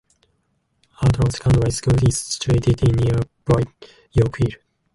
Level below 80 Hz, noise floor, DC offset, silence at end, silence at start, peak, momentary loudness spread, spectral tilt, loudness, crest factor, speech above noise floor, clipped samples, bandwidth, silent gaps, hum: -34 dBFS; -68 dBFS; under 0.1%; 0.4 s; 1 s; -4 dBFS; 6 LU; -6 dB/octave; -20 LUFS; 16 dB; 49 dB; under 0.1%; 11.5 kHz; none; none